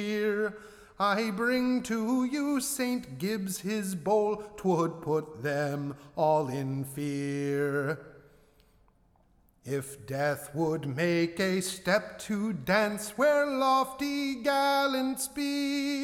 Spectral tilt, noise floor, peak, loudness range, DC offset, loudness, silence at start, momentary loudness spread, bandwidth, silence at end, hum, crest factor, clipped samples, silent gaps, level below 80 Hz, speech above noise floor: -5 dB/octave; -65 dBFS; -12 dBFS; 7 LU; under 0.1%; -30 LUFS; 0 s; 8 LU; 18 kHz; 0 s; none; 18 dB; under 0.1%; none; -64 dBFS; 35 dB